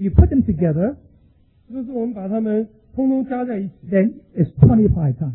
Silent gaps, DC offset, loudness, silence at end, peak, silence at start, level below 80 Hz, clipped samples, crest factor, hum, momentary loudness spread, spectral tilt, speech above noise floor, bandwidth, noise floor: none; under 0.1%; -19 LUFS; 0 s; 0 dBFS; 0 s; -28 dBFS; under 0.1%; 18 dB; none; 14 LU; -14.5 dB/octave; 37 dB; 3.6 kHz; -54 dBFS